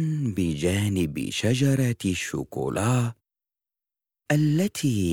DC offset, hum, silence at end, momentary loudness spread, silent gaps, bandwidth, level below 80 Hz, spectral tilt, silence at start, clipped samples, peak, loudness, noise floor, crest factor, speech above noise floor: under 0.1%; none; 0 s; 7 LU; none; 18 kHz; -54 dBFS; -6 dB/octave; 0 s; under 0.1%; -10 dBFS; -25 LUFS; -88 dBFS; 16 dB; 65 dB